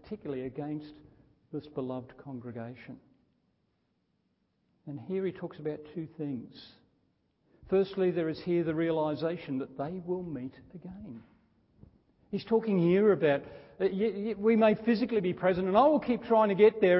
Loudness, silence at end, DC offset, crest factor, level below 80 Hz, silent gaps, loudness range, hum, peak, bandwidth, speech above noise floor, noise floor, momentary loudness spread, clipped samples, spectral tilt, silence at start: -30 LUFS; 0 s; under 0.1%; 20 dB; -66 dBFS; none; 16 LU; none; -10 dBFS; 5.8 kHz; 47 dB; -76 dBFS; 20 LU; under 0.1%; -11 dB/octave; 0.05 s